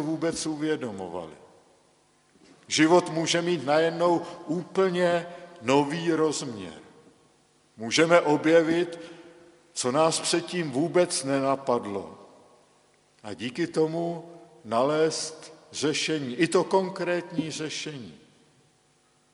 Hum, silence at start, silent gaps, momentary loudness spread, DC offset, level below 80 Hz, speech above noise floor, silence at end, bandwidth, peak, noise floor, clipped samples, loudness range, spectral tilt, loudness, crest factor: none; 0 s; none; 18 LU; under 0.1%; -70 dBFS; 39 dB; 1.15 s; 11.5 kHz; -4 dBFS; -65 dBFS; under 0.1%; 5 LU; -4 dB/octave; -26 LUFS; 24 dB